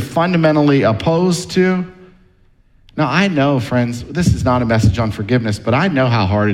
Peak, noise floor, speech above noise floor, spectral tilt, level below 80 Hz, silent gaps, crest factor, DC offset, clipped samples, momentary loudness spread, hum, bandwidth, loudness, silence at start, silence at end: -2 dBFS; -51 dBFS; 37 dB; -6.5 dB/octave; -34 dBFS; none; 14 dB; under 0.1%; under 0.1%; 6 LU; none; 13.5 kHz; -15 LUFS; 0 s; 0 s